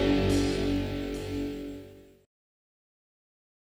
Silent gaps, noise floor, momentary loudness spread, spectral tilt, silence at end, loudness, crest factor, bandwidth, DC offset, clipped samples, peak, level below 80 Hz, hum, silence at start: none; -49 dBFS; 17 LU; -6 dB/octave; 1.7 s; -30 LUFS; 16 dB; 16.5 kHz; under 0.1%; under 0.1%; -14 dBFS; -42 dBFS; none; 0 s